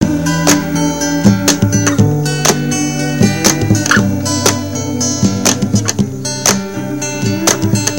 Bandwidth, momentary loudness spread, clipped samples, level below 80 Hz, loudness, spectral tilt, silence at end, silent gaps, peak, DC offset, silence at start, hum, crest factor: over 20 kHz; 6 LU; 0.2%; -38 dBFS; -13 LUFS; -4 dB/octave; 0 s; none; 0 dBFS; 1%; 0 s; none; 14 dB